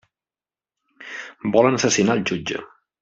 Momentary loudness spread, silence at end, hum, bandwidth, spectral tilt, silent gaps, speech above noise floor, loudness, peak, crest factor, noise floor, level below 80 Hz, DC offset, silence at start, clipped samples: 17 LU; 0.35 s; none; 8.2 kHz; -4 dB/octave; none; over 71 dB; -20 LUFS; -2 dBFS; 20 dB; under -90 dBFS; -60 dBFS; under 0.1%; 1 s; under 0.1%